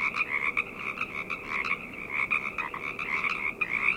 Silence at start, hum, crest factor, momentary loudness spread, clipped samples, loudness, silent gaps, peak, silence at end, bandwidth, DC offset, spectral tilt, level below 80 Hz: 0 s; none; 20 dB; 6 LU; under 0.1%; -29 LUFS; none; -12 dBFS; 0 s; 17 kHz; under 0.1%; -3.5 dB/octave; -58 dBFS